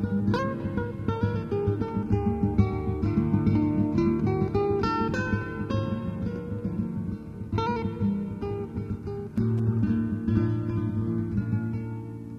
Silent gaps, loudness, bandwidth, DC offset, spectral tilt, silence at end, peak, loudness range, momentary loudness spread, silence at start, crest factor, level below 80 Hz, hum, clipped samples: none; -28 LUFS; 7 kHz; under 0.1%; -9 dB/octave; 0 s; -8 dBFS; 5 LU; 8 LU; 0 s; 18 dB; -42 dBFS; none; under 0.1%